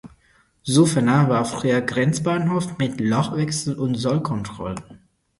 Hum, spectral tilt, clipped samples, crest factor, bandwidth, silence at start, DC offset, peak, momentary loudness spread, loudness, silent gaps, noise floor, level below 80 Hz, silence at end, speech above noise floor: none; -6 dB/octave; under 0.1%; 18 dB; 11.5 kHz; 0.05 s; under 0.1%; -2 dBFS; 12 LU; -21 LUFS; none; -59 dBFS; -52 dBFS; 0.45 s; 39 dB